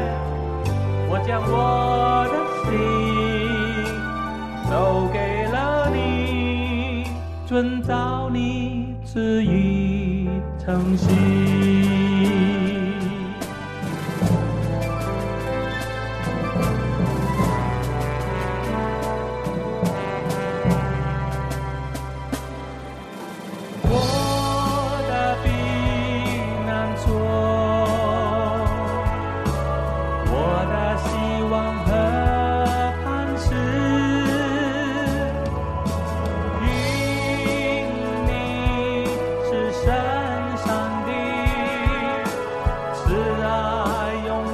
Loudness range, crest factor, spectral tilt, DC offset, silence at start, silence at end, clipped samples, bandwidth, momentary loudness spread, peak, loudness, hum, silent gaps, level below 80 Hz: 4 LU; 16 dB; -6.5 dB/octave; under 0.1%; 0 s; 0 s; under 0.1%; 14 kHz; 7 LU; -6 dBFS; -22 LUFS; none; none; -32 dBFS